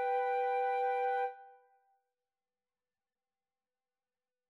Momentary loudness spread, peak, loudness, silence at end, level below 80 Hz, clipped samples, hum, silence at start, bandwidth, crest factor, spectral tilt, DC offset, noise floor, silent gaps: 4 LU; -24 dBFS; -34 LUFS; 3 s; under -90 dBFS; under 0.1%; none; 0 s; 5.8 kHz; 14 dB; 0.5 dB/octave; under 0.1%; under -90 dBFS; none